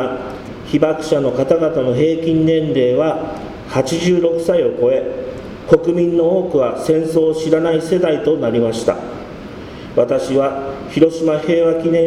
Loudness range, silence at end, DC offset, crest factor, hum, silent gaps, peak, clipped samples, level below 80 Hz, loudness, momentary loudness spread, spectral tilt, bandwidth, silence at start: 2 LU; 0 s; under 0.1%; 16 dB; none; none; 0 dBFS; under 0.1%; -44 dBFS; -16 LUFS; 12 LU; -6.5 dB/octave; 12 kHz; 0 s